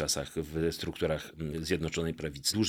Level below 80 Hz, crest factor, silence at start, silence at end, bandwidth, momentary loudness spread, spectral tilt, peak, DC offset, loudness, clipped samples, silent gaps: -50 dBFS; 18 dB; 0 s; 0 s; 17 kHz; 5 LU; -4 dB/octave; -14 dBFS; under 0.1%; -33 LUFS; under 0.1%; none